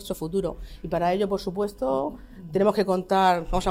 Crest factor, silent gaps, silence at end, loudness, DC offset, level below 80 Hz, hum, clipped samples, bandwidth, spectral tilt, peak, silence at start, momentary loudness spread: 16 dB; none; 0 s; -25 LUFS; under 0.1%; -42 dBFS; none; under 0.1%; 16 kHz; -6 dB/octave; -8 dBFS; 0 s; 12 LU